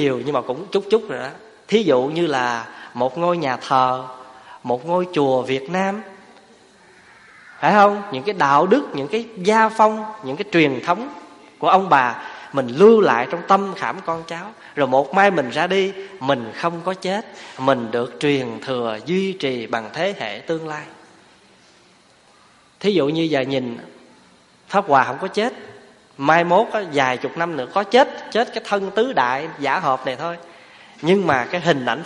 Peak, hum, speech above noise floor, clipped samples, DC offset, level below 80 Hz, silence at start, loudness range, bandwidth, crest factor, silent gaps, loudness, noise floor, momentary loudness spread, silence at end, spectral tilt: 0 dBFS; none; 34 dB; under 0.1%; under 0.1%; -66 dBFS; 0 s; 7 LU; 11 kHz; 20 dB; none; -19 LUFS; -53 dBFS; 13 LU; 0 s; -5.5 dB/octave